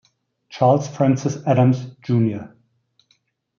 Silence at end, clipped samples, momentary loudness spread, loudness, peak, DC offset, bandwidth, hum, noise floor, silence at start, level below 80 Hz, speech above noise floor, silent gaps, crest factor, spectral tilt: 1.1 s; under 0.1%; 8 LU; -19 LUFS; -4 dBFS; under 0.1%; 7.2 kHz; none; -65 dBFS; 0.5 s; -64 dBFS; 47 dB; none; 16 dB; -8 dB/octave